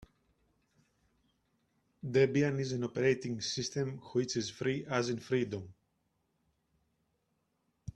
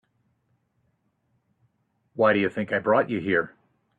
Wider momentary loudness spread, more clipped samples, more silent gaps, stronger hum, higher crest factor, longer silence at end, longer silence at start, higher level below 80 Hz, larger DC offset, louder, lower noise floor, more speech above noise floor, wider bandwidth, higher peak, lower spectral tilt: about the same, 10 LU vs 10 LU; neither; neither; neither; about the same, 20 dB vs 20 dB; second, 0.05 s vs 0.5 s; about the same, 2.05 s vs 2.15 s; about the same, -68 dBFS vs -70 dBFS; neither; second, -33 LUFS vs -24 LUFS; first, -79 dBFS vs -72 dBFS; about the same, 47 dB vs 49 dB; first, 10 kHz vs 7.6 kHz; second, -16 dBFS vs -8 dBFS; second, -5 dB/octave vs -8 dB/octave